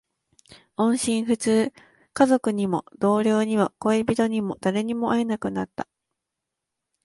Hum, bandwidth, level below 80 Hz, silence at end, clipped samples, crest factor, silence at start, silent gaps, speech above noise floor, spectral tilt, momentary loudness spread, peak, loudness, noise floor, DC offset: none; 11.5 kHz; -60 dBFS; 1.2 s; under 0.1%; 18 dB; 0.5 s; none; 61 dB; -5.5 dB/octave; 10 LU; -6 dBFS; -23 LUFS; -84 dBFS; under 0.1%